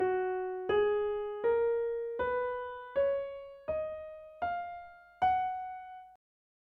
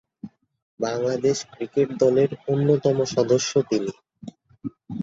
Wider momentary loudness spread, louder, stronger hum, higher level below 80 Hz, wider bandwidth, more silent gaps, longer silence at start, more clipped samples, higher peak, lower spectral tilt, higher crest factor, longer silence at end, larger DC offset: second, 15 LU vs 23 LU; second, -33 LUFS vs -22 LUFS; neither; about the same, -62 dBFS vs -62 dBFS; second, 4.8 kHz vs 8 kHz; second, none vs 0.62-0.78 s; second, 0 s vs 0.25 s; neither; second, -18 dBFS vs -6 dBFS; first, -7.5 dB/octave vs -5.5 dB/octave; about the same, 16 dB vs 18 dB; first, 0.65 s vs 0 s; neither